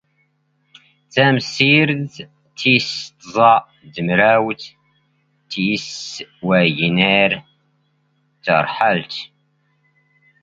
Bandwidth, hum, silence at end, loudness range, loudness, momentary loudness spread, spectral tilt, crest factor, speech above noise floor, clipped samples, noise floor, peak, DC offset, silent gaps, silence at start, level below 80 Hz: 7.8 kHz; none; 1.15 s; 3 LU; -16 LUFS; 17 LU; -5 dB/octave; 20 dB; 48 dB; under 0.1%; -64 dBFS; 0 dBFS; under 0.1%; none; 1.15 s; -58 dBFS